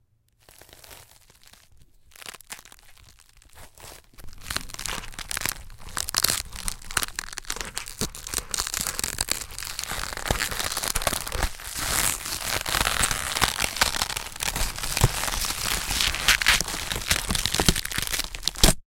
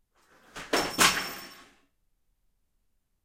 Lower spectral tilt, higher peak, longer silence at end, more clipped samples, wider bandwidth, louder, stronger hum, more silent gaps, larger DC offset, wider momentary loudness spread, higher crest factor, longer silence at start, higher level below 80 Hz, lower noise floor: about the same, -1.5 dB/octave vs -1 dB/octave; first, 0 dBFS vs -8 dBFS; second, 0.05 s vs 1.65 s; neither; about the same, 17 kHz vs 16 kHz; about the same, -25 LUFS vs -25 LUFS; neither; neither; neither; second, 15 LU vs 24 LU; about the same, 28 dB vs 26 dB; first, 0.8 s vs 0.55 s; first, -36 dBFS vs -60 dBFS; second, -59 dBFS vs -73 dBFS